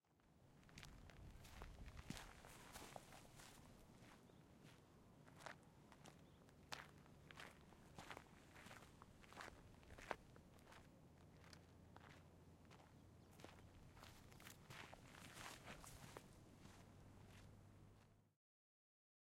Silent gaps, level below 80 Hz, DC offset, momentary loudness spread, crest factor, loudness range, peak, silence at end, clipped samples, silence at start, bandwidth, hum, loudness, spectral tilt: none; -72 dBFS; under 0.1%; 11 LU; 34 dB; 5 LU; -28 dBFS; 1.05 s; under 0.1%; 0.05 s; 16 kHz; none; -62 LUFS; -4 dB/octave